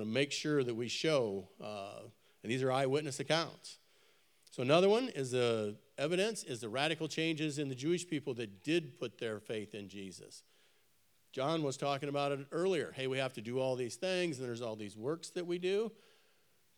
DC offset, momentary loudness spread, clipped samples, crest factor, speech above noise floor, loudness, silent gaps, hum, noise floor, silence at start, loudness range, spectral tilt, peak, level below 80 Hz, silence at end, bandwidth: under 0.1%; 13 LU; under 0.1%; 24 dB; 38 dB; -36 LUFS; none; none; -74 dBFS; 0 s; 6 LU; -5 dB/octave; -14 dBFS; under -90 dBFS; 0.85 s; 17.5 kHz